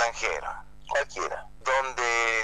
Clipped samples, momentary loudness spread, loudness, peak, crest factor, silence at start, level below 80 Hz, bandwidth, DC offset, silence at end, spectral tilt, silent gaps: under 0.1%; 10 LU; -28 LUFS; -10 dBFS; 18 dB; 0 s; -50 dBFS; 11.5 kHz; 0.6%; 0 s; -1 dB/octave; none